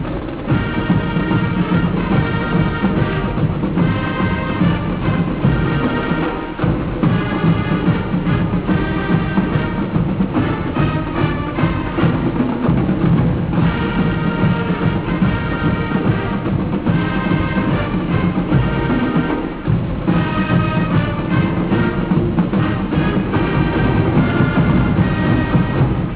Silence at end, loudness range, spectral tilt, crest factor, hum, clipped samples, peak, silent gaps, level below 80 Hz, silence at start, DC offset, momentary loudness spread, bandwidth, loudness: 0 s; 2 LU; -11.5 dB/octave; 14 dB; none; under 0.1%; -2 dBFS; none; -28 dBFS; 0 s; 0.5%; 3 LU; 4 kHz; -17 LUFS